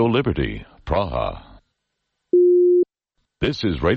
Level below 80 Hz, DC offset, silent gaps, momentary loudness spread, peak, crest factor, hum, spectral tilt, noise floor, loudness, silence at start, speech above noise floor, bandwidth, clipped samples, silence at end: -36 dBFS; under 0.1%; none; 13 LU; -8 dBFS; 12 dB; none; -8 dB/octave; -77 dBFS; -20 LUFS; 0 s; 56 dB; 6.4 kHz; under 0.1%; 0 s